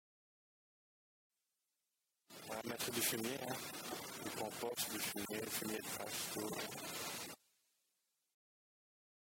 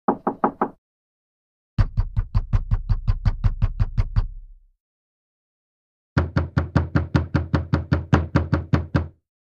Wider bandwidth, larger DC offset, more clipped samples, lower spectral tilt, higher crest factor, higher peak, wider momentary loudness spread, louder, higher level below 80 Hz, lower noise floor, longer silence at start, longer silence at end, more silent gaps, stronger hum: first, 17 kHz vs 7 kHz; neither; neither; second, -2 dB/octave vs -8.5 dB/octave; about the same, 22 dB vs 22 dB; second, -24 dBFS vs -2 dBFS; first, 10 LU vs 5 LU; second, -43 LUFS vs -24 LUFS; second, -80 dBFS vs -28 dBFS; first, -89 dBFS vs -41 dBFS; first, 2.3 s vs 0.1 s; first, 1.95 s vs 0.4 s; second, none vs 0.78-1.77 s, 4.80-6.16 s; neither